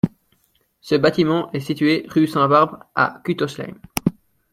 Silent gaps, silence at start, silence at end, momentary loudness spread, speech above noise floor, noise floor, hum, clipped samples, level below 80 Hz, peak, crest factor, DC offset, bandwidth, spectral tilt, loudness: none; 0.05 s; 0.4 s; 10 LU; 45 dB; -64 dBFS; none; under 0.1%; -54 dBFS; 0 dBFS; 20 dB; under 0.1%; 16.5 kHz; -6 dB/octave; -20 LUFS